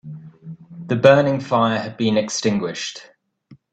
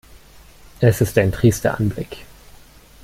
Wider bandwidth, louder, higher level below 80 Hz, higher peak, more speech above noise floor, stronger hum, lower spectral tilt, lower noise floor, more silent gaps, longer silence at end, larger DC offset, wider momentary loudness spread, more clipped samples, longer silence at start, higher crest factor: second, 8.8 kHz vs 16 kHz; about the same, -19 LUFS vs -18 LUFS; second, -58 dBFS vs -40 dBFS; about the same, 0 dBFS vs -2 dBFS; first, 33 dB vs 28 dB; neither; second, -5 dB/octave vs -6.5 dB/octave; first, -51 dBFS vs -45 dBFS; neither; second, 0.2 s vs 0.8 s; neither; first, 25 LU vs 16 LU; neither; about the same, 0.05 s vs 0.15 s; about the same, 20 dB vs 18 dB